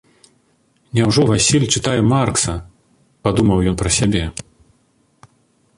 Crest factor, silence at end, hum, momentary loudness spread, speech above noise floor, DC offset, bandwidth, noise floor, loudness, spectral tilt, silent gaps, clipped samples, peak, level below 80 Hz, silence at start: 18 dB; 1.35 s; none; 10 LU; 44 dB; under 0.1%; 11.5 kHz; -60 dBFS; -16 LUFS; -4.5 dB/octave; none; under 0.1%; 0 dBFS; -36 dBFS; 0.95 s